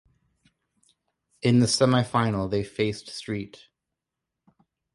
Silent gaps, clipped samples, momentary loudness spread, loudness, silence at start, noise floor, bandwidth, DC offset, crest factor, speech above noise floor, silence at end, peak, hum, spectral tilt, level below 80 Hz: none; under 0.1%; 13 LU; -25 LUFS; 1.45 s; -86 dBFS; 11.5 kHz; under 0.1%; 20 dB; 62 dB; 1.5 s; -8 dBFS; none; -5.5 dB/octave; -56 dBFS